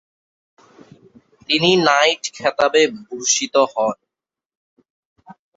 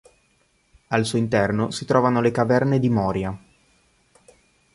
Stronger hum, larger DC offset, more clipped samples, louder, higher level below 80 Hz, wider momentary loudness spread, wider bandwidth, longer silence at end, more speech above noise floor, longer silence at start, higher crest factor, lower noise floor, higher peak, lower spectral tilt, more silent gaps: neither; neither; neither; first, -17 LUFS vs -21 LUFS; second, -64 dBFS vs -50 dBFS; about the same, 9 LU vs 7 LU; second, 8 kHz vs 11.5 kHz; second, 0.25 s vs 1.35 s; first, 70 dB vs 44 dB; first, 1.5 s vs 0.9 s; about the same, 20 dB vs 20 dB; first, -87 dBFS vs -64 dBFS; first, 0 dBFS vs -4 dBFS; second, -2.5 dB/octave vs -6.5 dB/octave; first, 4.46-4.50 s, 4.57-4.77 s, 4.90-5.16 s vs none